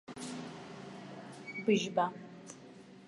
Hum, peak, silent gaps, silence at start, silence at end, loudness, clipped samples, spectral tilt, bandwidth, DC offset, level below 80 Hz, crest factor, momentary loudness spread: none; -16 dBFS; none; 0.1 s; 0 s; -35 LUFS; under 0.1%; -5 dB/octave; 11.5 kHz; under 0.1%; -78 dBFS; 22 dB; 20 LU